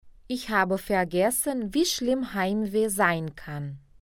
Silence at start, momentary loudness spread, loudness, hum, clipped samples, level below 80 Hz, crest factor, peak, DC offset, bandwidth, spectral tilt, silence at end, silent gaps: 0.05 s; 12 LU; -26 LUFS; none; under 0.1%; -52 dBFS; 18 dB; -8 dBFS; under 0.1%; 17.5 kHz; -4 dB/octave; 0.25 s; none